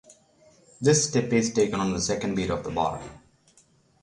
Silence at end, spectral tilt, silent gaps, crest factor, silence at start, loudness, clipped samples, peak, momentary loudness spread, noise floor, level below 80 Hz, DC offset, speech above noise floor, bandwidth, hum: 0.85 s; -4.5 dB/octave; none; 18 dB; 0.8 s; -25 LUFS; under 0.1%; -8 dBFS; 7 LU; -61 dBFS; -52 dBFS; under 0.1%; 37 dB; 11.5 kHz; none